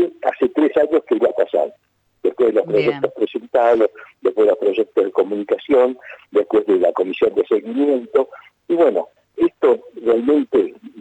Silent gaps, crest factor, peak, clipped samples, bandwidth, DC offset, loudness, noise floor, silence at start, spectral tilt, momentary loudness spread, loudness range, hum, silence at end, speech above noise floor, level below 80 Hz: none; 12 dB; -4 dBFS; under 0.1%; 8 kHz; under 0.1%; -18 LUFS; -60 dBFS; 0 s; -7.5 dB/octave; 7 LU; 1 LU; none; 0 s; 43 dB; -62 dBFS